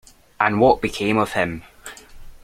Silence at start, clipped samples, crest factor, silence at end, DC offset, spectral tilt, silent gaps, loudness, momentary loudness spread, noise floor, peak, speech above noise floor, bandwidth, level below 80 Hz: 0.4 s; under 0.1%; 20 dB; 0.05 s; under 0.1%; -5.5 dB/octave; none; -19 LUFS; 22 LU; -40 dBFS; -2 dBFS; 21 dB; 16 kHz; -44 dBFS